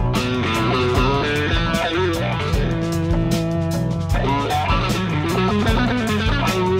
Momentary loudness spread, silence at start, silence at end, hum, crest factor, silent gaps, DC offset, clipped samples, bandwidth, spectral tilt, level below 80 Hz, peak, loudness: 3 LU; 0 s; 0 s; none; 14 dB; none; under 0.1%; under 0.1%; 16 kHz; -6 dB/octave; -28 dBFS; -6 dBFS; -20 LUFS